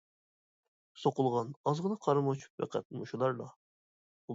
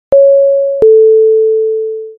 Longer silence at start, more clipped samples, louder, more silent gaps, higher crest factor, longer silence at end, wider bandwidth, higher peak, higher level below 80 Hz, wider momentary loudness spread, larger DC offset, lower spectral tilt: first, 0.95 s vs 0.1 s; neither; second, -34 LUFS vs -8 LUFS; first, 1.56-1.64 s, 2.50-2.58 s, 2.85-2.90 s, 3.56-4.28 s vs none; first, 20 dB vs 8 dB; about the same, 0 s vs 0.05 s; first, 7.8 kHz vs 1.7 kHz; second, -14 dBFS vs 0 dBFS; second, -80 dBFS vs -50 dBFS; about the same, 10 LU vs 8 LU; neither; second, -7.5 dB/octave vs -9.5 dB/octave